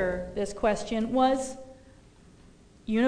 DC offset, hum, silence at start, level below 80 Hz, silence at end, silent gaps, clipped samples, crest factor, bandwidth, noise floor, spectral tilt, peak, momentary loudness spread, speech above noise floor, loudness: under 0.1%; none; 0 s; -48 dBFS; 0 s; none; under 0.1%; 16 dB; 10 kHz; -55 dBFS; -5 dB/octave; -12 dBFS; 20 LU; 27 dB; -28 LUFS